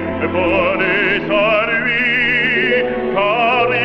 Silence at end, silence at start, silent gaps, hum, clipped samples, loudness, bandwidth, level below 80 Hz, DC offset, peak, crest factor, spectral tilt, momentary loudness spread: 0 s; 0 s; none; none; under 0.1%; -14 LUFS; 7 kHz; -44 dBFS; under 0.1%; -2 dBFS; 12 dB; -6.5 dB/octave; 4 LU